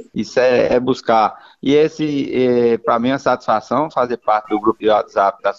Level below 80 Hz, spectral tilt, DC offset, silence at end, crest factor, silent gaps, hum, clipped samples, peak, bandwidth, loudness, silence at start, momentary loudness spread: -52 dBFS; -6 dB/octave; under 0.1%; 0.05 s; 16 dB; none; none; under 0.1%; 0 dBFS; 7.6 kHz; -16 LUFS; 0 s; 4 LU